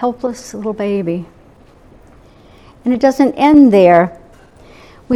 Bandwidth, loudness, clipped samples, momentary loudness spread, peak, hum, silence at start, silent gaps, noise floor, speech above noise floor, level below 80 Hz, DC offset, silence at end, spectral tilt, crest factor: 12 kHz; -13 LUFS; under 0.1%; 16 LU; 0 dBFS; none; 0 s; none; -44 dBFS; 32 dB; -46 dBFS; under 0.1%; 0 s; -7 dB/octave; 14 dB